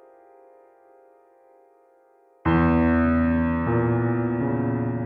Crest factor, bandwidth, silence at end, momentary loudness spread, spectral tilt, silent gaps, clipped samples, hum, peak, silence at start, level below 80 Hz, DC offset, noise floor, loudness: 16 dB; 4.4 kHz; 0 s; 5 LU; -11.5 dB/octave; none; under 0.1%; none; -8 dBFS; 2.45 s; -44 dBFS; under 0.1%; -58 dBFS; -22 LUFS